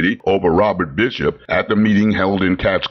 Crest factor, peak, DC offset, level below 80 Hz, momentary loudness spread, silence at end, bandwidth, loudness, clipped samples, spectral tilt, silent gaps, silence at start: 12 dB; -4 dBFS; under 0.1%; -40 dBFS; 4 LU; 0 s; 6.4 kHz; -16 LUFS; under 0.1%; -7.5 dB/octave; none; 0 s